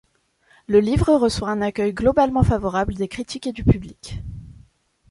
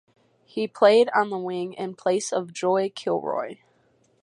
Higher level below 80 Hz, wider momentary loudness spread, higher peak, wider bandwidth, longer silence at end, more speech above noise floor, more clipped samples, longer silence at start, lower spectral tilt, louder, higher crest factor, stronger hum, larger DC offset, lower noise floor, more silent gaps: first, -34 dBFS vs -78 dBFS; first, 17 LU vs 13 LU; about the same, -2 dBFS vs -4 dBFS; about the same, 11.5 kHz vs 11.5 kHz; about the same, 0.6 s vs 0.7 s; about the same, 41 dB vs 40 dB; neither; first, 0.7 s vs 0.55 s; first, -7 dB/octave vs -4 dB/octave; first, -20 LUFS vs -24 LUFS; about the same, 18 dB vs 20 dB; neither; neither; second, -60 dBFS vs -64 dBFS; neither